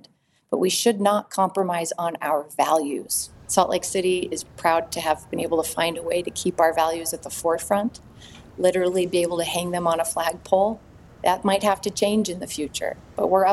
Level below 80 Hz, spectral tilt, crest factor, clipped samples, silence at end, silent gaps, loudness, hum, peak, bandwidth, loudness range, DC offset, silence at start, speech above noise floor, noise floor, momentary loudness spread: -56 dBFS; -3.5 dB/octave; 20 dB; under 0.1%; 0 s; none; -23 LUFS; none; -2 dBFS; 16 kHz; 1 LU; under 0.1%; 0.5 s; 34 dB; -57 dBFS; 7 LU